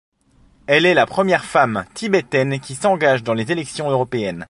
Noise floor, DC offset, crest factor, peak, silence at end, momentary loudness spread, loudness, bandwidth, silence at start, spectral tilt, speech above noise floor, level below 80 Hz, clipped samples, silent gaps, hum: -54 dBFS; under 0.1%; 18 dB; -2 dBFS; 0.05 s; 8 LU; -18 LUFS; 11.5 kHz; 0.7 s; -5 dB/octave; 36 dB; -54 dBFS; under 0.1%; none; none